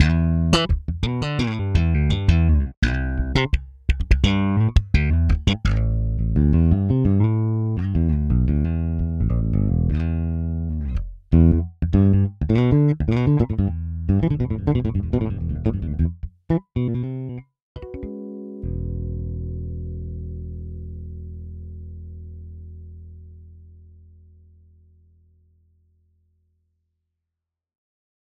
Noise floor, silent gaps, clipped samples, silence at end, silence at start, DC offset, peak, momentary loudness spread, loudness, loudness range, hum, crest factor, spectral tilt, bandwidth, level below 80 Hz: -85 dBFS; 2.77-2.82 s, 17.62-17.75 s; under 0.1%; 4.6 s; 0 s; under 0.1%; -2 dBFS; 18 LU; -21 LUFS; 16 LU; none; 20 dB; -7.5 dB/octave; 9.6 kHz; -26 dBFS